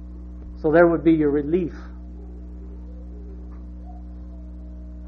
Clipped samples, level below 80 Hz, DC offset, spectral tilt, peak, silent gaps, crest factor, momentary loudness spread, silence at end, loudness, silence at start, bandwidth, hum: under 0.1%; -36 dBFS; under 0.1%; -10.5 dB/octave; -4 dBFS; none; 20 dB; 22 LU; 0 s; -19 LUFS; 0 s; 4.7 kHz; 60 Hz at -35 dBFS